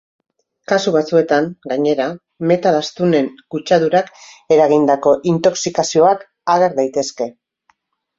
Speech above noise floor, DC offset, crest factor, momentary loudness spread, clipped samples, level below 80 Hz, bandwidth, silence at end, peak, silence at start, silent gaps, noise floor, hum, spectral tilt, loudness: 46 dB; under 0.1%; 16 dB; 10 LU; under 0.1%; -60 dBFS; 7.8 kHz; 0.85 s; 0 dBFS; 0.7 s; none; -62 dBFS; none; -5 dB/octave; -16 LUFS